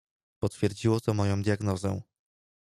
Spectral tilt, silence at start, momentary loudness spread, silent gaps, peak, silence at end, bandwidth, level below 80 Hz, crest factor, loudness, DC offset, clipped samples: -7 dB/octave; 0.4 s; 8 LU; none; -12 dBFS; 0.7 s; 13.5 kHz; -58 dBFS; 18 dB; -29 LUFS; under 0.1%; under 0.1%